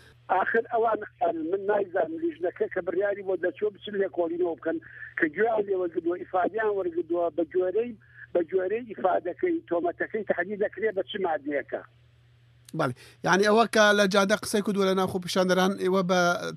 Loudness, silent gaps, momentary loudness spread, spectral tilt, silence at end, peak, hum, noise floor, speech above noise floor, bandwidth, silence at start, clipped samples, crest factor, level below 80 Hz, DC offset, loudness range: -27 LUFS; none; 9 LU; -5 dB/octave; 0 s; -8 dBFS; none; -58 dBFS; 32 dB; 14 kHz; 0.3 s; under 0.1%; 18 dB; -68 dBFS; under 0.1%; 6 LU